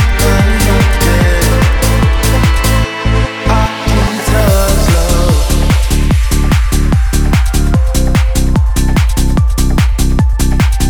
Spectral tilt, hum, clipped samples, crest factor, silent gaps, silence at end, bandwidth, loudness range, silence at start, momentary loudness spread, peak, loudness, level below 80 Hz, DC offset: -5 dB/octave; none; under 0.1%; 10 dB; none; 0 s; over 20 kHz; 1 LU; 0 s; 2 LU; 0 dBFS; -12 LUFS; -12 dBFS; 0.5%